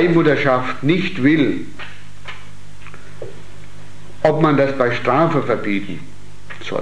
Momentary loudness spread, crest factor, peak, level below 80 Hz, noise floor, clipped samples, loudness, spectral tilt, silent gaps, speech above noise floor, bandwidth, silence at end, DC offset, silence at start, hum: 21 LU; 18 dB; 0 dBFS; -50 dBFS; -40 dBFS; under 0.1%; -17 LUFS; -7 dB/octave; none; 24 dB; 11 kHz; 0 s; 6%; 0 s; 50 Hz at -45 dBFS